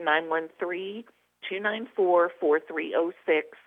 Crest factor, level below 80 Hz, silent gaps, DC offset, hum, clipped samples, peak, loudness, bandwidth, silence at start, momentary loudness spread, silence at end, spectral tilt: 18 dB; -82 dBFS; none; under 0.1%; none; under 0.1%; -10 dBFS; -27 LUFS; 3.9 kHz; 0 s; 12 LU; 0.1 s; -6.5 dB/octave